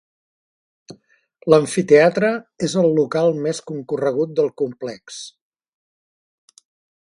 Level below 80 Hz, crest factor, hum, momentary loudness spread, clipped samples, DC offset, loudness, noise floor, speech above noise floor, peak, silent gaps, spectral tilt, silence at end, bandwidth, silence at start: -64 dBFS; 20 dB; none; 18 LU; under 0.1%; under 0.1%; -18 LUFS; -54 dBFS; 36 dB; 0 dBFS; none; -5.5 dB/octave; 1.85 s; 11.5 kHz; 0.9 s